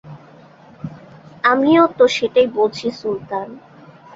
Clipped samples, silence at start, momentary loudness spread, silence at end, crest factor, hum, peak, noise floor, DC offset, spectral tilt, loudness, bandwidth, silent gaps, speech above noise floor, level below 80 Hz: under 0.1%; 0.05 s; 21 LU; 0.6 s; 16 dB; none; -2 dBFS; -44 dBFS; under 0.1%; -5 dB/octave; -17 LUFS; 7.8 kHz; none; 28 dB; -60 dBFS